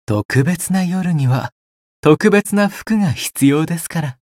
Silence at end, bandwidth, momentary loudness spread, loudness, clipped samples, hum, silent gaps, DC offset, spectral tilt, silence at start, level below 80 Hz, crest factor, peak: 0.2 s; 16.5 kHz; 8 LU; -16 LUFS; under 0.1%; none; 0.25-0.29 s, 1.52-2.03 s; under 0.1%; -6 dB/octave; 0.1 s; -50 dBFS; 16 dB; 0 dBFS